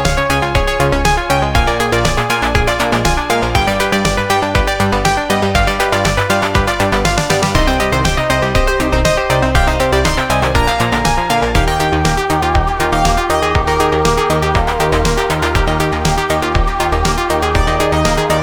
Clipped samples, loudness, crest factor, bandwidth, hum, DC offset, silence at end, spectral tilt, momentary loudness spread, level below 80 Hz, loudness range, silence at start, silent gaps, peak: under 0.1%; -14 LUFS; 14 dB; 19.5 kHz; none; under 0.1%; 0 s; -4.5 dB/octave; 2 LU; -20 dBFS; 1 LU; 0 s; none; 0 dBFS